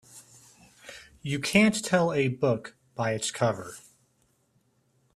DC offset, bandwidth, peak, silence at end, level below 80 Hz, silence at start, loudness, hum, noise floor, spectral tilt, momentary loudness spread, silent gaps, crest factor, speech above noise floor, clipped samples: under 0.1%; 14 kHz; -6 dBFS; 1.35 s; -64 dBFS; 0.15 s; -26 LUFS; none; -69 dBFS; -5 dB/octave; 24 LU; none; 24 dB; 43 dB; under 0.1%